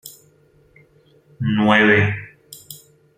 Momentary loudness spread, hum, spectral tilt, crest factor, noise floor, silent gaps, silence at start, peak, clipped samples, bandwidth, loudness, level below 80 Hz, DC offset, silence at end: 26 LU; none; -6 dB/octave; 20 dB; -55 dBFS; none; 0.05 s; -2 dBFS; under 0.1%; 16 kHz; -16 LUFS; -58 dBFS; under 0.1%; 0.45 s